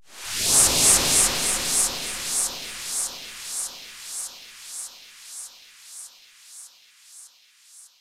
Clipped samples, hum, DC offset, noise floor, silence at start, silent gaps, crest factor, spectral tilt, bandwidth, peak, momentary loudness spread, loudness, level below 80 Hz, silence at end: under 0.1%; none; under 0.1%; -54 dBFS; 0.1 s; none; 22 dB; 0 dB/octave; 16 kHz; -4 dBFS; 25 LU; -20 LUFS; -48 dBFS; 0.15 s